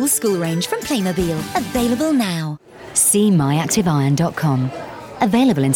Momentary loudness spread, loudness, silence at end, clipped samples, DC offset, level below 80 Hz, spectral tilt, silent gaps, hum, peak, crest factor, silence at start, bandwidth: 10 LU; -18 LUFS; 0 s; under 0.1%; under 0.1%; -44 dBFS; -5 dB/octave; none; none; -6 dBFS; 12 dB; 0 s; 20 kHz